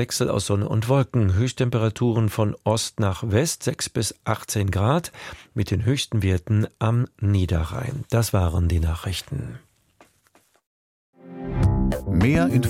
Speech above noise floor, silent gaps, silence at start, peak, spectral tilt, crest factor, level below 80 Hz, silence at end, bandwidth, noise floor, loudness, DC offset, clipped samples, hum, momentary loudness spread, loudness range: 39 dB; 10.66-11.13 s; 0 s; -4 dBFS; -6 dB/octave; 18 dB; -36 dBFS; 0 s; 16 kHz; -61 dBFS; -23 LUFS; under 0.1%; under 0.1%; none; 8 LU; 6 LU